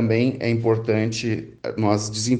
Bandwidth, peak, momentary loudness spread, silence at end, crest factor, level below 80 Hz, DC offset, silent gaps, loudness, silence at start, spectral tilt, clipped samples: 9.8 kHz; -4 dBFS; 7 LU; 0 s; 16 dB; -56 dBFS; under 0.1%; none; -22 LUFS; 0 s; -5.5 dB/octave; under 0.1%